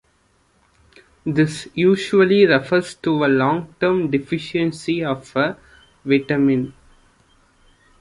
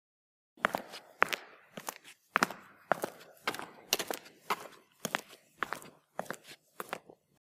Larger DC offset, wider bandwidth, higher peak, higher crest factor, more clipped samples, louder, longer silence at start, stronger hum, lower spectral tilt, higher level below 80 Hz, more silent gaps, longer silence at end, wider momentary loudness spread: neither; second, 11.5 kHz vs 16.5 kHz; about the same, -2 dBFS vs -4 dBFS; second, 18 dB vs 34 dB; neither; first, -19 LUFS vs -37 LUFS; first, 1.25 s vs 0.6 s; neither; first, -6.5 dB/octave vs -2 dB/octave; first, -56 dBFS vs -82 dBFS; neither; first, 1.3 s vs 0.45 s; second, 9 LU vs 16 LU